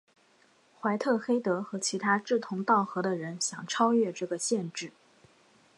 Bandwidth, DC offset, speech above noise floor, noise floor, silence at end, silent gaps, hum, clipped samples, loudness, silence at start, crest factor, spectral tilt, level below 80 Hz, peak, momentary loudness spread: 11.5 kHz; under 0.1%; 35 dB; -64 dBFS; 0.9 s; none; none; under 0.1%; -29 LUFS; 0.85 s; 18 dB; -4 dB/octave; -82 dBFS; -12 dBFS; 7 LU